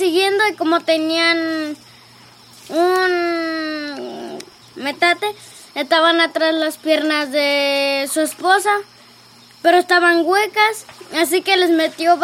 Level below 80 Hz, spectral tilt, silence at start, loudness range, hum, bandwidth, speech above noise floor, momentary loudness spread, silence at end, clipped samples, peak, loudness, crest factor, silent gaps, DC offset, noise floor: -70 dBFS; -1.5 dB/octave; 0 s; 4 LU; none; 16.5 kHz; 29 dB; 14 LU; 0 s; under 0.1%; 0 dBFS; -16 LUFS; 18 dB; none; under 0.1%; -45 dBFS